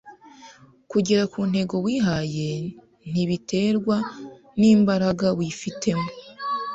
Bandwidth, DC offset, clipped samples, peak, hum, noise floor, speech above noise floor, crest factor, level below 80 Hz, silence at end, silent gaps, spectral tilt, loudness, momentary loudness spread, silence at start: 8 kHz; under 0.1%; under 0.1%; -8 dBFS; none; -49 dBFS; 27 dB; 16 dB; -56 dBFS; 0 s; none; -6 dB/octave; -23 LUFS; 15 LU; 0.05 s